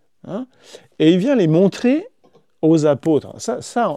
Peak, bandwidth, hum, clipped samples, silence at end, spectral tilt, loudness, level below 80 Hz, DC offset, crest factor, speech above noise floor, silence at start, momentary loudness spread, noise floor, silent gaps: -2 dBFS; 11 kHz; none; under 0.1%; 0 s; -7 dB/octave; -17 LUFS; -66 dBFS; 0.1%; 16 dB; 39 dB; 0.25 s; 15 LU; -56 dBFS; none